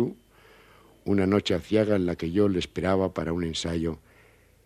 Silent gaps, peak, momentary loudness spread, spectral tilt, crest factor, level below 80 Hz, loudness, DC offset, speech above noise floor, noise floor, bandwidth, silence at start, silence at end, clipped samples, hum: none; -10 dBFS; 8 LU; -6.5 dB/octave; 18 dB; -50 dBFS; -26 LUFS; under 0.1%; 32 dB; -58 dBFS; 14 kHz; 0 s; 0.65 s; under 0.1%; none